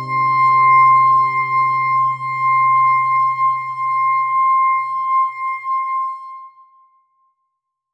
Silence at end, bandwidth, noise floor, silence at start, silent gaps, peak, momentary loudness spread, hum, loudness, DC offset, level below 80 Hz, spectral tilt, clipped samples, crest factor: 1.45 s; 5.6 kHz; -74 dBFS; 0 s; none; -4 dBFS; 10 LU; none; -15 LUFS; under 0.1%; -70 dBFS; -5.5 dB/octave; under 0.1%; 12 dB